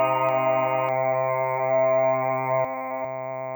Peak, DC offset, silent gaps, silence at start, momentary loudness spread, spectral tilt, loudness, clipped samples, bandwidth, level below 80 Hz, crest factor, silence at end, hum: -12 dBFS; under 0.1%; none; 0 s; 9 LU; -9 dB/octave; -24 LUFS; under 0.1%; over 20 kHz; -78 dBFS; 12 dB; 0 s; none